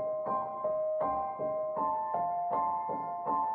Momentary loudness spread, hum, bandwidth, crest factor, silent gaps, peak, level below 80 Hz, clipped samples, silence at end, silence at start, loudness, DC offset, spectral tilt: 3 LU; none; 3.4 kHz; 12 dB; none; -20 dBFS; -68 dBFS; under 0.1%; 0 s; 0 s; -33 LUFS; under 0.1%; -7.5 dB/octave